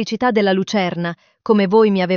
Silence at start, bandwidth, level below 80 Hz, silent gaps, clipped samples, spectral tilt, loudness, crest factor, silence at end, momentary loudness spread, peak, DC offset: 0 s; 7 kHz; -60 dBFS; none; under 0.1%; -5 dB/octave; -17 LUFS; 14 dB; 0 s; 12 LU; -2 dBFS; under 0.1%